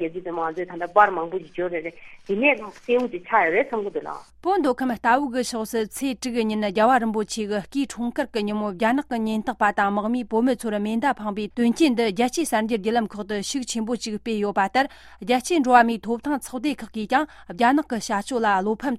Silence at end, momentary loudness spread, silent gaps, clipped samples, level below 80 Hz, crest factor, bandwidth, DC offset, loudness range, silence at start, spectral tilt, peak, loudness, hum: 0 s; 9 LU; none; under 0.1%; -56 dBFS; 20 dB; 15 kHz; under 0.1%; 2 LU; 0 s; -4.5 dB/octave; -2 dBFS; -23 LUFS; none